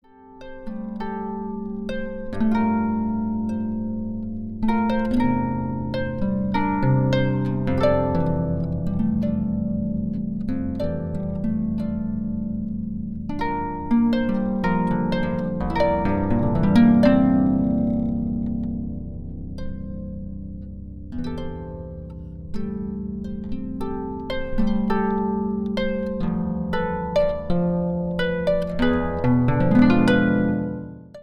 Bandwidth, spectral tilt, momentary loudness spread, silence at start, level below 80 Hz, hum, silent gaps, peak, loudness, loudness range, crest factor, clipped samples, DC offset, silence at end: 9.2 kHz; -9 dB/octave; 15 LU; 0.2 s; -36 dBFS; none; none; -4 dBFS; -23 LUFS; 11 LU; 18 dB; under 0.1%; under 0.1%; 0 s